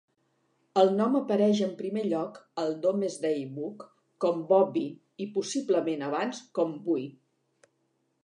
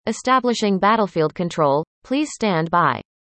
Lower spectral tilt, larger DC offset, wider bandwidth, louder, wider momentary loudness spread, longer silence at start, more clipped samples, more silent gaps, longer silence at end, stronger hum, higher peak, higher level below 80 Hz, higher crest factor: about the same, -6 dB/octave vs -5.5 dB/octave; neither; first, 11 kHz vs 8.8 kHz; second, -28 LUFS vs -20 LUFS; first, 13 LU vs 6 LU; first, 0.75 s vs 0.05 s; neither; second, none vs 1.87-2.02 s; first, 1.15 s vs 0.35 s; neither; second, -10 dBFS vs -4 dBFS; second, -82 dBFS vs -58 dBFS; first, 20 dB vs 14 dB